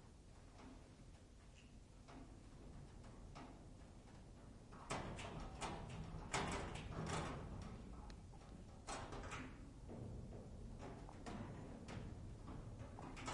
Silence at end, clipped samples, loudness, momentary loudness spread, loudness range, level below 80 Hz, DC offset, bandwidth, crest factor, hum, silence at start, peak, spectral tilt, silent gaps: 0 s; under 0.1%; -53 LUFS; 15 LU; 12 LU; -60 dBFS; under 0.1%; 11.5 kHz; 24 dB; none; 0 s; -28 dBFS; -5 dB/octave; none